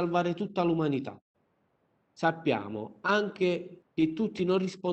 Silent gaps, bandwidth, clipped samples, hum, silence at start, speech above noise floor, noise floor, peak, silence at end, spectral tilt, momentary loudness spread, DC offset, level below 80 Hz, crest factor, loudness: 1.21-1.34 s; 8.6 kHz; under 0.1%; none; 0 s; 44 dB; -73 dBFS; -12 dBFS; 0 s; -7 dB/octave; 7 LU; under 0.1%; -68 dBFS; 18 dB; -30 LUFS